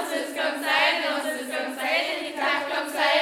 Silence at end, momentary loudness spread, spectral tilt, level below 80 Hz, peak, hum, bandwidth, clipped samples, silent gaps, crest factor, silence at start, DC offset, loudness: 0 s; 8 LU; -0.5 dB/octave; -84 dBFS; -8 dBFS; none; 17.5 kHz; under 0.1%; none; 18 dB; 0 s; under 0.1%; -24 LUFS